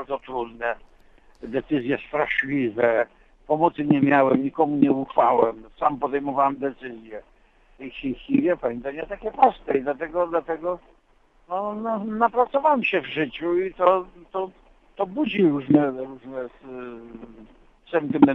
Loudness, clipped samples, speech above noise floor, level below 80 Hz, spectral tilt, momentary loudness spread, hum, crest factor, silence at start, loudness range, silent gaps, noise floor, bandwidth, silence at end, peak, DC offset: -23 LUFS; under 0.1%; 36 dB; -54 dBFS; -9 dB/octave; 17 LU; none; 22 dB; 0 s; 5 LU; none; -59 dBFS; 4.1 kHz; 0 s; -2 dBFS; under 0.1%